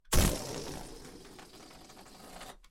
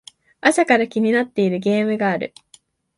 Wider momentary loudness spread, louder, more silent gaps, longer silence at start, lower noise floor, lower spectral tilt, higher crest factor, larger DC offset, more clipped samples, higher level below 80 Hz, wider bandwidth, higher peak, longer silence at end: first, 22 LU vs 5 LU; second, -34 LUFS vs -19 LUFS; neither; second, 0.1 s vs 0.45 s; about the same, -53 dBFS vs -54 dBFS; second, -3.5 dB/octave vs -5 dB/octave; about the same, 22 dB vs 20 dB; neither; neither; first, -40 dBFS vs -66 dBFS; first, 16 kHz vs 11.5 kHz; second, -12 dBFS vs 0 dBFS; second, 0.15 s vs 0.7 s